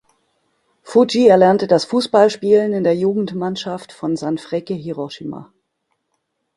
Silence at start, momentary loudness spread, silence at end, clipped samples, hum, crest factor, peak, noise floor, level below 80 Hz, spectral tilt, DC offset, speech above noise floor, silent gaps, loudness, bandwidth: 0.85 s; 15 LU; 1.15 s; under 0.1%; none; 18 dB; 0 dBFS; -72 dBFS; -60 dBFS; -6 dB/octave; under 0.1%; 56 dB; none; -16 LUFS; 11.5 kHz